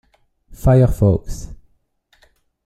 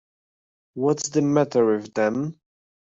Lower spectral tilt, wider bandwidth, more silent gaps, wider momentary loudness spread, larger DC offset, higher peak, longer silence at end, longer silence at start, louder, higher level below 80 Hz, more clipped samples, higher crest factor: first, -9 dB/octave vs -5.5 dB/octave; first, 13.5 kHz vs 8 kHz; neither; first, 21 LU vs 10 LU; neither; first, -2 dBFS vs -8 dBFS; first, 1.1 s vs 0.55 s; second, 0.5 s vs 0.75 s; first, -16 LUFS vs -23 LUFS; first, -30 dBFS vs -66 dBFS; neither; about the same, 18 dB vs 16 dB